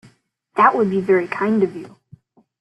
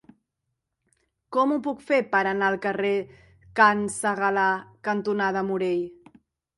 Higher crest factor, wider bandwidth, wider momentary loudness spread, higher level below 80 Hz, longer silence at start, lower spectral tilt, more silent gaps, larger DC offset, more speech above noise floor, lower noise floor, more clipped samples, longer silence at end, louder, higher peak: about the same, 18 dB vs 22 dB; second, 8.6 kHz vs 11.5 kHz; about the same, 11 LU vs 10 LU; about the same, -62 dBFS vs -64 dBFS; second, 0.55 s vs 1.3 s; first, -8 dB/octave vs -4.5 dB/octave; neither; neither; second, 39 dB vs 57 dB; second, -56 dBFS vs -81 dBFS; neither; about the same, 0.75 s vs 0.65 s; first, -18 LUFS vs -24 LUFS; about the same, -2 dBFS vs -4 dBFS